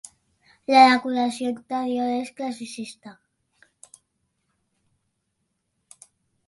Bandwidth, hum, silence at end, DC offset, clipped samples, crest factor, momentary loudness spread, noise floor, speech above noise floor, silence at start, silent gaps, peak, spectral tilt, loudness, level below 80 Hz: 11.5 kHz; none; 3.35 s; under 0.1%; under 0.1%; 24 dB; 21 LU; -76 dBFS; 54 dB; 0.7 s; none; -2 dBFS; -3 dB/octave; -21 LUFS; -72 dBFS